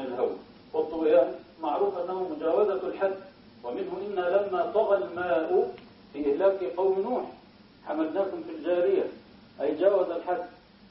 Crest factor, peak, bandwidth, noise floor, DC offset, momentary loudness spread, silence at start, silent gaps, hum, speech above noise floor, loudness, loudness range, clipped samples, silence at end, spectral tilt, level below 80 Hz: 18 dB; -10 dBFS; 5.8 kHz; -53 dBFS; under 0.1%; 11 LU; 0 s; none; none; 27 dB; -28 LUFS; 2 LU; under 0.1%; 0.35 s; -9.5 dB/octave; -66 dBFS